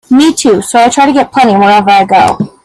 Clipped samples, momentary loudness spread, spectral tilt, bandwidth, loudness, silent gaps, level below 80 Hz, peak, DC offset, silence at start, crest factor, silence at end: 0.2%; 3 LU; -4 dB/octave; 14 kHz; -7 LUFS; none; -44 dBFS; 0 dBFS; under 0.1%; 0.1 s; 6 dB; 0.15 s